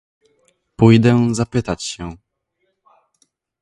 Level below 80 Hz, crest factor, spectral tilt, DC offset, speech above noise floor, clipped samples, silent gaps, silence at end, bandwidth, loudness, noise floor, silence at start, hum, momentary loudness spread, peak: -46 dBFS; 18 dB; -6.5 dB/octave; under 0.1%; 56 dB; under 0.1%; none; 1.45 s; 11.5 kHz; -16 LUFS; -70 dBFS; 0.8 s; none; 17 LU; 0 dBFS